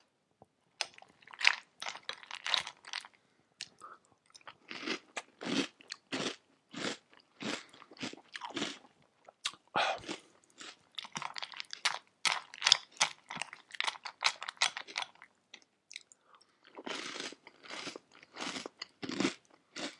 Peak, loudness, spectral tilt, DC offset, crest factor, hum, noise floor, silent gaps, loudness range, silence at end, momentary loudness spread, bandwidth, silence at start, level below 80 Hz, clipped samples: 0 dBFS; -36 LUFS; -1 dB/octave; under 0.1%; 40 dB; none; -70 dBFS; none; 10 LU; 0 s; 19 LU; 11.5 kHz; 0.8 s; -86 dBFS; under 0.1%